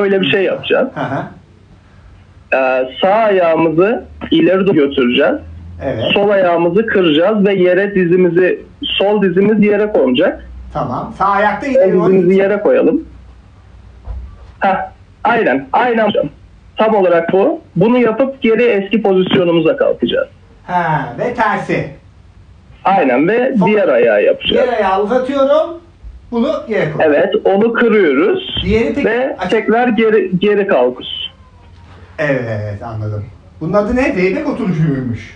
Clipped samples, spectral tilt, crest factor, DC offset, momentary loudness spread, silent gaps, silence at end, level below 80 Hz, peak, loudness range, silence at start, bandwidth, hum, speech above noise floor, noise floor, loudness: under 0.1%; -7.5 dB/octave; 12 dB; under 0.1%; 11 LU; none; 0 s; -40 dBFS; -2 dBFS; 5 LU; 0 s; 8 kHz; none; 30 dB; -43 dBFS; -13 LUFS